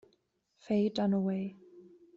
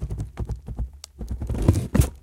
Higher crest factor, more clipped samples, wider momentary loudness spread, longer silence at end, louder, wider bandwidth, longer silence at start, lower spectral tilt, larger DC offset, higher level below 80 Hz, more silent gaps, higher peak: second, 16 dB vs 22 dB; neither; second, 8 LU vs 14 LU; first, 0.35 s vs 0.05 s; second, -32 LUFS vs -27 LUFS; second, 7.4 kHz vs 16.5 kHz; first, 0.7 s vs 0 s; about the same, -7 dB/octave vs -7 dB/octave; neither; second, -74 dBFS vs -30 dBFS; neither; second, -18 dBFS vs -2 dBFS